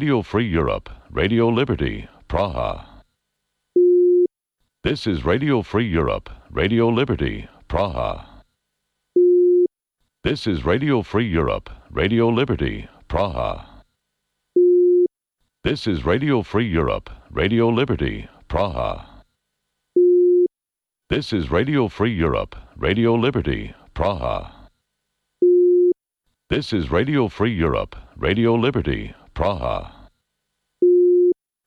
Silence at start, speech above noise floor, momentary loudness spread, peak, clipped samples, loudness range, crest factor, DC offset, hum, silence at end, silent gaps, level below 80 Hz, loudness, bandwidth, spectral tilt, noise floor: 0 s; 67 dB; 12 LU; -8 dBFS; under 0.1%; 3 LU; 12 dB; under 0.1%; none; 0.35 s; none; -36 dBFS; -20 LUFS; 6.4 kHz; -8 dB/octave; -87 dBFS